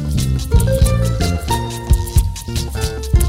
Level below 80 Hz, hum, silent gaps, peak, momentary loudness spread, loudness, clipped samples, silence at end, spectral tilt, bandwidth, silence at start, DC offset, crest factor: -18 dBFS; none; none; 0 dBFS; 7 LU; -18 LUFS; under 0.1%; 0 s; -5.5 dB/octave; 16.5 kHz; 0 s; under 0.1%; 16 dB